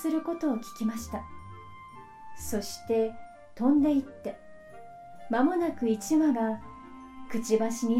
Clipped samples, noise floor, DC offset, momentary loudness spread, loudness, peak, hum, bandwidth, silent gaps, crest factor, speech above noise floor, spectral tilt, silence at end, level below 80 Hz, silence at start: under 0.1%; -47 dBFS; under 0.1%; 23 LU; -29 LUFS; -12 dBFS; none; 16 kHz; none; 16 dB; 20 dB; -5.5 dB/octave; 0 s; -56 dBFS; 0 s